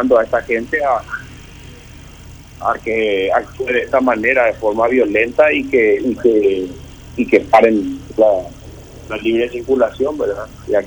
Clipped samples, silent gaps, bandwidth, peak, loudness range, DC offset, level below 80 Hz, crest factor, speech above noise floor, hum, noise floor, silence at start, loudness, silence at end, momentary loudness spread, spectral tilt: under 0.1%; none; over 20 kHz; 0 dBFS; 6 LU; under 0.1%; -42 dBFS; 16 dB; 22 dB; none; -37 dBFS; 0 s; -15 LUFS; 0 s; 15 LU; -6 dB/octave